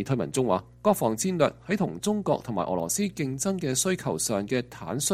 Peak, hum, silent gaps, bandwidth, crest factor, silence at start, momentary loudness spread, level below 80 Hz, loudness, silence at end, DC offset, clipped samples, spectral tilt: -8 dBFS; none; none; 16 kHz; 20 dB; 0 s; 4 LU; -58 dBFS; -27 LUFS; 0 s; under 0.1%; under 0.1%; -4.5 dB/octave